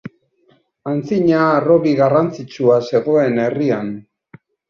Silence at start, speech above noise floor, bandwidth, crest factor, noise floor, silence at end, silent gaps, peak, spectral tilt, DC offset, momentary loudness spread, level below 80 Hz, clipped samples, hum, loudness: 0.05 s; 42 dB; 7.2 kHz; 14 dB; -58 dBFS; 0.7 s; none; -2 dBFS; -8 dB/octave; under 0.1%; 10 LU; -58 dBFS; under 0.1%; none; -16 LUFS